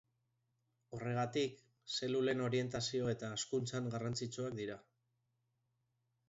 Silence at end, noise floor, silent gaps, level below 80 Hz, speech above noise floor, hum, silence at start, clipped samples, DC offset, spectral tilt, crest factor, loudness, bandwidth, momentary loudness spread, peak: 1.5 s; -83 dBFS; none; -72 dBFS; 44 dB; none; 0.9 s; under 0.1%; under 0.1%; -5 dB/octave; 18 dB; -39 LUFS; 7.6 kHz; 10 LU; -22 dBFS